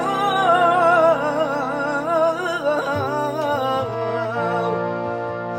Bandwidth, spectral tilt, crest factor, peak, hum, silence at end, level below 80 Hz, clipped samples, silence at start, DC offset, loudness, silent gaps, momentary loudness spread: 16 kHz; -5.5 dB/octave; 16 dB; -4 dBFS; none; 0 s; -58 dBFS; under 0.1%; 0 s; under 0.1%; -20 LUFS; none; 9 LU